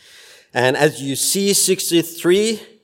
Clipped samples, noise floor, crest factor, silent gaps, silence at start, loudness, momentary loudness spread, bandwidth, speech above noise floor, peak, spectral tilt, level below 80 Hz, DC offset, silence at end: under 0.1%; -46 dBFS; 18 dB; none; 0.55 s; -17 LUFS; 5 LU; 16.5 kHz; 28 dB; 0 dBFS; -3 dB/octave; -64 dBFS; under 0.1%; 0.2 s